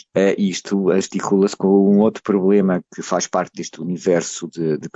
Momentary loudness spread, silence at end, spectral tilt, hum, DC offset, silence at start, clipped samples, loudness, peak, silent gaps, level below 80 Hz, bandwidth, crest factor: 9 LU; 0.05 s; -6 dB/octave; none; under 0.1%; 0.15 s; under 0.1%; -18 LUFS; -4 dBFS; none; -64 dBFS; 8.2 kHz; 14 dB